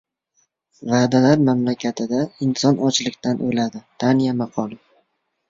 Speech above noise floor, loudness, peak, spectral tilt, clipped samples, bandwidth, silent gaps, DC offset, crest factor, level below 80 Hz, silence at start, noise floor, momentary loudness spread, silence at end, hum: 50 dB; -20 LUFS; -2 dBFS; -5.5 dB/octave; under 0.1%; 7.8 kHz; none; under 0.1%; 18 dB; -60 dBFS; 0.8 s; -69 dBFS; 10 LU; 0.75 s; none